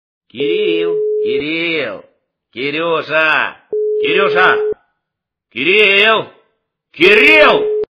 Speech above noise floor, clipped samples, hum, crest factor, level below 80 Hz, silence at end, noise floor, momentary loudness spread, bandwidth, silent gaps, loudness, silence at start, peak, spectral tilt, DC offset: 66 dB; 0.2%; none; 14 dB; -54 dBFS; 0.1 s; -79 dBFS; 15 LU; 5.4 kHz; none; -12 LUFS; 0.35 s; 0 dBFS; -5 dB/octave; under 0.1%